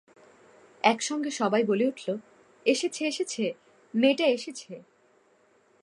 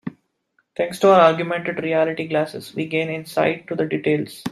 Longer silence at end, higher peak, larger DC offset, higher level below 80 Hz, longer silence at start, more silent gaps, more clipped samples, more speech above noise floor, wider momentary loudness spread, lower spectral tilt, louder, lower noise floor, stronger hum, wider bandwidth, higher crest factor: first, 1 s vs 0 s; second, -6 dBFS vs -2 dBFS; neither; second, -84 dBFS vs -66 dBFS; first, 0.85 s vs 0.05 s; neither; neither; second, 37 dB vs 48 dB; about the same, 14 LU vs 12 LU; second, -3.5 dB/octave vs -6 dB/octave; second, -27 LUFS vs -20 LUFS; second, -64 dBFS vs -68 dBFS; neither; second, 11.5 kHz vs 14.5 kHz; about the same, 24 dB vs 20 dB